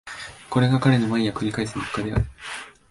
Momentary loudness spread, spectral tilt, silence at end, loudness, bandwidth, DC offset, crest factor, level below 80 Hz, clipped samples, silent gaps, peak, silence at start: 16 LU; -6.5 dB/octave; 0.2 s; -23 LUFS; 11.5 kHz; under 0.1%; 18 dB; -40 dBFS; under 0.1%; none; -6 dBFS; 0.05 s